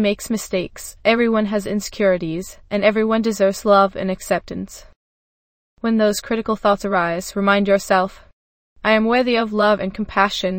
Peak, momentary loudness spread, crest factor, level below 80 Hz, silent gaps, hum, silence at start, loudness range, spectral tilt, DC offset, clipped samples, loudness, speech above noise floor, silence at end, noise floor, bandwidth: 0 dBFS; 10 LU; 18 dB; -46 dBFS; 4.96-5.77 s, 8.33-8.76 s; none; 0 s; 3 LU; -5 dB/octave; under 0.1%; under 0.1%; -19 LUFS; over 72 dB; 0 s; under -90 dBFS; 16.5 kHz